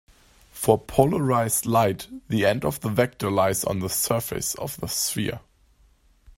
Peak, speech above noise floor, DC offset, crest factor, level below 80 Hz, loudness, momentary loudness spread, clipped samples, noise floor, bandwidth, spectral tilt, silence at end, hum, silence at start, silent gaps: -2 dBFS; 35 dB; under 0.1%; 24 dB; -50 dBFS; -24 LUFS; 8 LU; under 0.1%; -59 dBFS; 16.5 kHz; -4.5 dB/octave; 0.05 s; none; 0.55 s; none